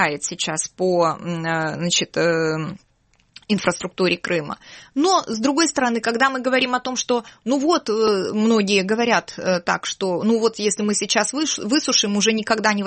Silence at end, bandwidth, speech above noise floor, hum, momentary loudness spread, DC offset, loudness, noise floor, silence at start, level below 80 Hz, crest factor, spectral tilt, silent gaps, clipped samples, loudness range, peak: 0 s; 8.8 kHz; 41 dB; none; 6 LU; under 0.1%; -20 LUFS; -61 dBFS; 0 s; -60 dBFS; 18 dB; -3.5 dB/octave; none; under 0.1%; 3 LU; -4 dBFS